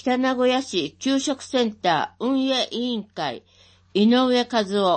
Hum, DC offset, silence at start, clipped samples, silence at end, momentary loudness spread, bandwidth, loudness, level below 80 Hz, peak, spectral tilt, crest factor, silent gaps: none; under 0.1%; 0.05 s; under 0.1%; 0 s; 9 LU; 8.8 kHz; -22 LUFS; -66 dBFS; -8 dBFS; -4 dB/octave; 14 dB; none